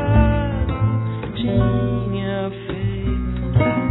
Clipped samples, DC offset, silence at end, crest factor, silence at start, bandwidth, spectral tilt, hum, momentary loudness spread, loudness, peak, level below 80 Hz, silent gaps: under 0.1%; under 0.1%; 0 s; 16 dB; 0 s; 4.1 kHz; -12 dB/octave; none; 7 LU; -21 LUFS; -4 dBFS; -26 dBFS; none